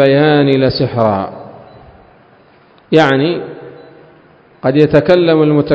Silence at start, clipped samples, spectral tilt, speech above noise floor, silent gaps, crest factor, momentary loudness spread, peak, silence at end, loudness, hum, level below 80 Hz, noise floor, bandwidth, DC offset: 0 s; 0.2%; -8 dB/octave; 36 dB; none; 12 dB; 15 LU; 0 dBFS; 0 s; -12 LUFS; none; -44 dBFS; -46 dBFS; 8 kHz; under 0.1%